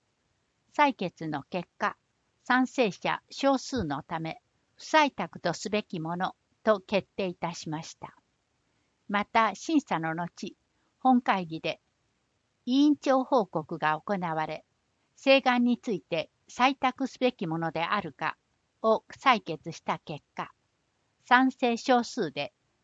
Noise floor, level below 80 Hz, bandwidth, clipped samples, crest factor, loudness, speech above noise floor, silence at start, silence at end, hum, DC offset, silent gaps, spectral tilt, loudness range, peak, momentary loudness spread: -75 dBFS; -68 dBFS; 8 kHz; under 0.1%; 24 dB; -28 LUFS; 47 dB; 0.8 s; 0.35 s; none; under 0.1%; none; -5 dB/octave; 4 LU; -6 dBFS; 14 LU